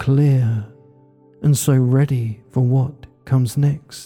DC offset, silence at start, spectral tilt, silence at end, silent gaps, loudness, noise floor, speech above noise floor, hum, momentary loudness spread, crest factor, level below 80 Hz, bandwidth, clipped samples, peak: under 0.1%; 0 s; -7 dB/octave; 0 s; none; -18 LUFS; -50 dBFS; 33 dB; none; 8 LU; 12 dB; -52 dBFS; 17.5 kHz; under 0.1%; -6 dBFS